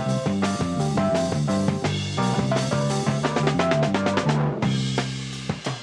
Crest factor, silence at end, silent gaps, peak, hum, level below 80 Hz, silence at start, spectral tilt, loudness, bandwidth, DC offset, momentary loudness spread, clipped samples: 18 dB; 0 s; none; -6 dBFS; none; -52 dBFS; 0 s; -6 dB/octave; -23 LUFS; 11.5 kHz; under 0.1%; 5 LU; under 0.1%